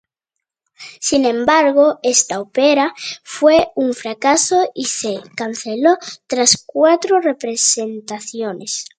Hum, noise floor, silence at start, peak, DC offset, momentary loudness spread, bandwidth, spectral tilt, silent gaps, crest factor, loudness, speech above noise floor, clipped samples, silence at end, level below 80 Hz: none; -81 dBFS; 0.8 s; 0 dBFS; under 0.1%; 12 LU; 9.8 kHz; -1.5 dB/octave; none; 16 dB; -16 LUFS; 65 dB; under 0.1%; 0.15 s; -58 dBFS